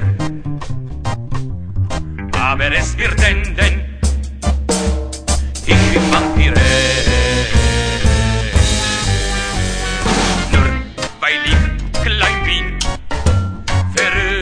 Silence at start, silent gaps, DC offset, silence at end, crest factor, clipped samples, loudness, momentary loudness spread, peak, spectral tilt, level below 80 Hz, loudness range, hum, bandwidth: 0 s; none; under 0.1%; 0 s; 14 dB; under 0.1%; -16 LUFS; 10 LU; 0 dBFS; -4 dB/octave; -20 dBFS; 3 LU; none; 10.5 kHz